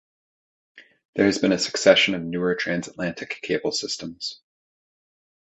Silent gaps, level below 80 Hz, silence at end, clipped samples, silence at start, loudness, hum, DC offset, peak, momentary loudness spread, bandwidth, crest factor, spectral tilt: 1.05-1.13 s; -60 dBFS; 1.15 s; under 0.1%; 0.75 s; -23 LUFS; none; under 0.1%; 0 dBFS; 15 LU; 8.2 kHz; 24 dB; -3.5 dB/octave